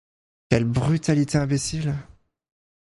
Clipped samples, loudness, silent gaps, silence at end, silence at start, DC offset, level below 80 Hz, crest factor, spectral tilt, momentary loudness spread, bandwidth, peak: under 0.1%; -23 LUFS; none; 0.85 s; 0.5 s; under 0.1%; -46 dBFS; 22 dB; -6 dB/octave; 7 LU; 11.5 kHz; -2 dBFS